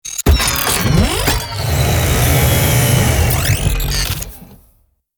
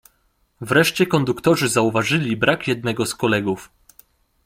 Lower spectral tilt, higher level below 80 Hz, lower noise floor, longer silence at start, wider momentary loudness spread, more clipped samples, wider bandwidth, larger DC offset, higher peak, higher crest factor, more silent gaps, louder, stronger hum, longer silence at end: about the same, -4 dB/octave vs -4.5 dB/octave; first, -22 dBFS vs -54 dBFS; second, -56 dBFS vs -64 dBFS; second, 0.05 s vs 0.6 s; about the same, 6 LU vs 6 LU; neither; first, over 20 kHz vs 16.5 kHz; neither; about the same, -2 dBFS vs -2 dBFS; about the same, 14 dB vs 18 dB; neither; first, -14 LUFS vs -19 LUFS; neither; second, 0.65 s vs 0.8 s